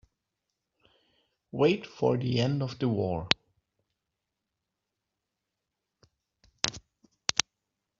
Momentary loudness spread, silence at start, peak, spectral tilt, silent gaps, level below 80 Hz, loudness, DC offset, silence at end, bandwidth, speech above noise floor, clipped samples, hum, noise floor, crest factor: 6 LU; 1.55 s; 0 dBFS; -4 dB/octave; none; -62 dBFS; -29 LUFS; under 0.1%; 0.6 s; 7.6 kHz; 58 dB; under 0.1%; none; -86 dBFS; 32 dB